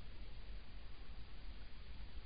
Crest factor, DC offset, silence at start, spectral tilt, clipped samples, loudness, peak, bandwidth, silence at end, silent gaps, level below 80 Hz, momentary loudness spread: 10 dB; 0.4%; 0 s; -4 dB/octave; under 0.1%; -57 LUFS; -36 dBFS; 5 kHz; 0 s; none; -54 dBFS; 2 LU